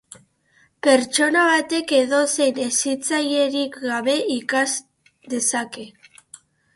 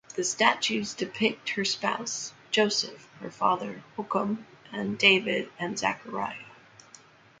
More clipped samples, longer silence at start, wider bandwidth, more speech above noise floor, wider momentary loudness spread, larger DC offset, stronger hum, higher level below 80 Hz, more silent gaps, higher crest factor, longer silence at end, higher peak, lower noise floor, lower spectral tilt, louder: neither; first, 0.85 s vs 0.1 s; first, 12 kHz vs 9.6 kHz; first, 40 dB vs 26 dB; second, 10 LU vs 14 LU; neither; neither; about the same, -70 dBFS vs -72 dBFS; neither; second, 18 dB vs 26 dB; about the same, 0.85 s vs 0.85 s; about the same, -4 dBFS vs -4 dBFS; first, -60 dBFS vs -55 dBFS; second, -1 dB/octave vs -2.5 dB/octave; first, -20 LUFS vs -27 LUFS